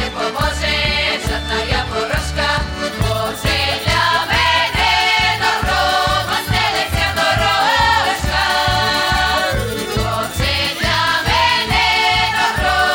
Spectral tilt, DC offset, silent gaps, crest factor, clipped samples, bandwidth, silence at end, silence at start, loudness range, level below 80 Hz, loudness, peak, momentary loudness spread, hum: -3 dB/octave; under 0.1%; none; 12 dB; under 0.1%; 17.5 kHz; 0 s; 0 s; 3 LU; -28 dBFS; -15 LUFS; -4 dBFS; 6 LU; none